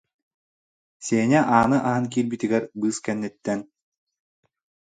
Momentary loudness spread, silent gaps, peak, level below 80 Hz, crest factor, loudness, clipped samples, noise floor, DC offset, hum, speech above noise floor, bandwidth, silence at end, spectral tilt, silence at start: 11 LU; none; -2 dBFS; -58 dBFS; 22 dB; -23 LUFS; under 0.1%; under -90 dBFS; under 0.1%; none; over 68 dB; 9.6 kHz; 1.25 s; -6 dB/octave; 1 s